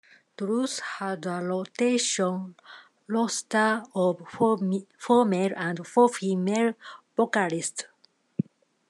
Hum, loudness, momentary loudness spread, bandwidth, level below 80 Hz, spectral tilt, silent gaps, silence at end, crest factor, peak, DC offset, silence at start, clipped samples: none; -26 LUFS; 12 LU; 12 kHz; -80 dBFS; -4.5 dB/octave; none; 0.5 s; 20 dB; -8 dBFS; under 0.1%; 0.4 s; under 0.1%